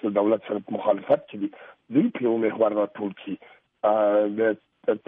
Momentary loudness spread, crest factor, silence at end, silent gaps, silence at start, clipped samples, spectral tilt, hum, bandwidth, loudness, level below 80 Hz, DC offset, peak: 11 LU; 18 dB; 0.1 s; none; 0.05 s; under 0.1%; -10 dB/octave; none; 3.8 kHz; -25 LUFS; -76 dBFS; under 0.1%; -8 dBFS